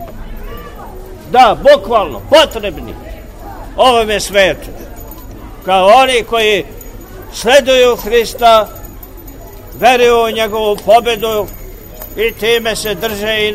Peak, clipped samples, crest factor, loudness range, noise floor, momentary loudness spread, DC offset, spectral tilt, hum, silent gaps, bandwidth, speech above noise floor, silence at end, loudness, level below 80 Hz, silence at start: 0 dBFS; 0.2%; 12 dB; 3 LU; -31 dBFS; 24 LU; 0.4%; -3 dB/octave; none; none; 16.5 kHz; 20 dB; 0 s; -11 LUFS; -32 dBFS; 0 s